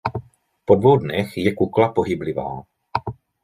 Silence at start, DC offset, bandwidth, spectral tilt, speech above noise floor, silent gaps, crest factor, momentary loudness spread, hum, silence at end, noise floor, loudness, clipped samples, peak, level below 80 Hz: 0.05 s; under 0.1%; 14.5 kHz; -8 dB/octave; 21 dB; none; 18 dB; 19 LU; none; 0.3 s; -40 dBFS; -20 LUFS; under 0.1%; -2 dBFS; -52 dBFS